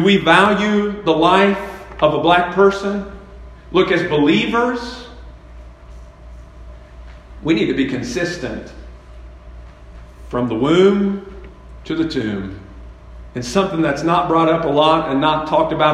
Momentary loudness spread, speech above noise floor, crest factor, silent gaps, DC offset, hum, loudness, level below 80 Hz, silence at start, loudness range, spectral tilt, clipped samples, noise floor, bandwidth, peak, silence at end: 17 LU; 22 dB; 18 dB; none; under 0.1%; none; -16 LUFS; -40 dBFS; 0 s; 7 LU; -6 dB/octave; under 0.1%; -38 dBFS; 11.5 kHz; 0 dBFS; 0 s